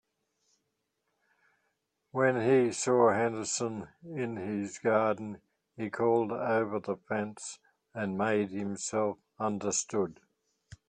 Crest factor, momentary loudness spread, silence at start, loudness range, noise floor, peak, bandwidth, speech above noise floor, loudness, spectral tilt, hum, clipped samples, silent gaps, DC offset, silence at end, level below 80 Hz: 20 dB; 14 LU; 2.15 s; 4 LU; -81 dBFS; -12 dBFS; 10.5 kHz; 51 dB; -31 LUFS; -4.5 dB/octave; none; under 0.1%; none; under 0.1%; 0.15 s; -74 dBFS